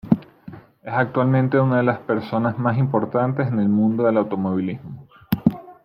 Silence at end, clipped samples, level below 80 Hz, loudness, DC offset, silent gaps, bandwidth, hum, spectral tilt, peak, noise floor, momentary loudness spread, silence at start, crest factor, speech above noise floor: 0.1 s; under 0.1%; -54 dBFS; -21 LUFS; under 0.1%; none; 15.5 kHz; none; -10 dB/octave; -2 dBFS; -42 dBFS; 10 LU; 0.05 s; 18 dB; 22 dB